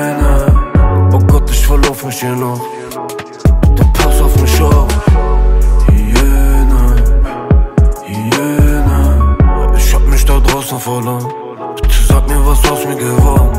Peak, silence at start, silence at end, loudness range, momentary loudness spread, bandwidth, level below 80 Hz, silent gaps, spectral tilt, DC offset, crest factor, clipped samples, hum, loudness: 0 dBFS; 0 s; 0 s; 2 LU; 8 LU; 16 kHz; -10 dBFS; none; -6 dB/octave; under 0.1%; 8 dB; under 0.1%; none; -12 LUFS